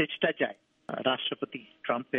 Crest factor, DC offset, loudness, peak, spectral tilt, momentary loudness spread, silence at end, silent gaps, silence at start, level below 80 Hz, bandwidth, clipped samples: 20 dB; under 0.1%; -32 LUFS; -12 dBFS; -7 dB/octave; 11 LU; 0 s; none; 0 s; -78 dBFS; 4.9 kHz; under 0.1%